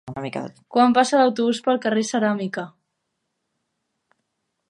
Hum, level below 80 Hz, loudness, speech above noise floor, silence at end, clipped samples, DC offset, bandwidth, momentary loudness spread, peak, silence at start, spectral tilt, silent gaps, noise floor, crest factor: none; -68 dBFS; -20 LUFS; 56 dB; 2 s; under 0.1%; under 0.1%; 11 kHz; 15 LU; -4 dBFS; 0.05 s; -4.5 dB/octave; none; -77 dBFS; 18 dB